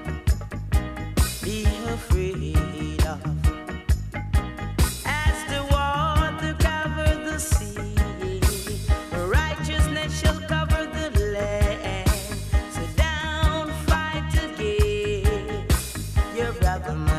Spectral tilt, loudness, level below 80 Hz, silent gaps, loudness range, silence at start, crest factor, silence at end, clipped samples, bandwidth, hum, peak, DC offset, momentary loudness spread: -5 dB/octave; -25 LUFS; -26 dBFS; none; 2 LU; 0 s; 16 dB; 0 s; under 0.1%; 15.5 kHz; none; -8 dBFS; under 0.1%; 4 LU